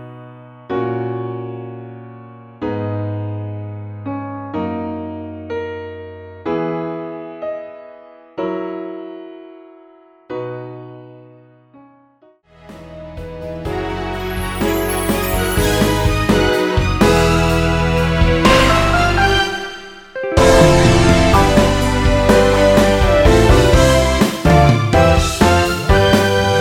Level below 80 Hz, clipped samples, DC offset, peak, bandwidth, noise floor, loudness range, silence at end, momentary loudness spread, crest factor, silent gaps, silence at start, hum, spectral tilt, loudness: -24 dBFS; under 0.1%; under 0.1%; 0 dBFS; 19 kHz; -51 dBFS; 18 LU; 0 s; 20 LU; 16 dB; none; 0 s; none; -5.5 dB/octave; -15 LUFS